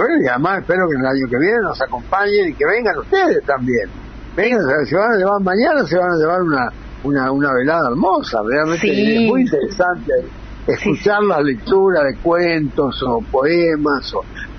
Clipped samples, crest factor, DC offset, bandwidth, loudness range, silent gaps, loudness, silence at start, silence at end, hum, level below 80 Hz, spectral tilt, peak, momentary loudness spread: under 0.1%; 14 dB; under 0.1%; 6.6 kHz; 1 LU; none; -16 LUFS; 0 s; 0 s; none; -38 dBFS; -6.5 dB/octave; -2 dBFS; 6 LU